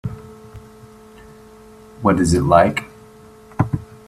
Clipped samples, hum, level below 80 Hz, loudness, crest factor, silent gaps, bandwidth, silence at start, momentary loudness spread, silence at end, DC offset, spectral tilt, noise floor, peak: under 0.1%; none; -42 dBFS; -17 LUFS; 20 dB; none; 14.5 kHz; 0.05 s; 26 LU; 0.25 s; under 0.1%; -6.5 dB/octave; -44 dBFS; 0 dBFS